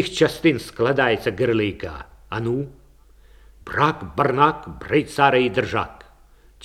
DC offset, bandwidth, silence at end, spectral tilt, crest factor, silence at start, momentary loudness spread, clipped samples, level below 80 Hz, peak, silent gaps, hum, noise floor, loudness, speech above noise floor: under 0.1%; 15 kHz; 0.7 s; -6 dB/octave; 20 dB; 0 s; 15 LU; under 0.1%; -48 dBFS; -2 dBFS; none; none; -51 dBFS; -21 LUFS; 30 dB